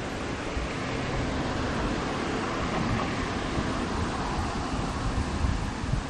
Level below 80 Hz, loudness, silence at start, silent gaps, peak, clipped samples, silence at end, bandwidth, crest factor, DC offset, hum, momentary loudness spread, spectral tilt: -36 dBFS; -30 LUFS; 0 s; none; -14 dBFS; under 0.1%; 0 s; 11 kHz; 14 dB; under 0.1%; none; 3 LU; -5.5 dB/octave